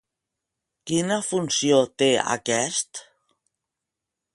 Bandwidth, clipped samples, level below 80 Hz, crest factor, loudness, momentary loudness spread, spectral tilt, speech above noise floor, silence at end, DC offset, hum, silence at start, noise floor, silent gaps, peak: 11.5 kHz; under 0.1%; -68 dBFS; 20 dB; -22 LUFS; 12 LU; -3 dB/octave; 63 dB; 1.3 s; under 0.1%; none; 0.85 s; -85 dBFS; none; -6 dBFS